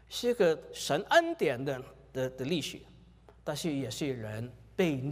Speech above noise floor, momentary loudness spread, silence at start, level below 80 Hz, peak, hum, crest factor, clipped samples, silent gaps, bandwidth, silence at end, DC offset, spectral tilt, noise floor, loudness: 26 dB; 15 LU; 0.1 s; -62 dBFS; -12 dBFS; none; 20 dB; under 0.1%; none; 15.5 kHz; 0 s; under 0.1%; -5 dB/octave; -57 dBFS; -32 LUFS